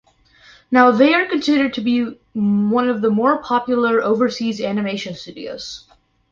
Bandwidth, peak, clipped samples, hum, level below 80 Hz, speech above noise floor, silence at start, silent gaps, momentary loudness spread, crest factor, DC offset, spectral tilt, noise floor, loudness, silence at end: 7.4 kHz; -2 dBFS; under 0.1%; none; -58 dBFS; 33 dB; 0.7 s; none; 16 LU; 16 dB; under 0.1%; -6 dB/octave; -50 dBFS; -17 LUFS; 0.55 s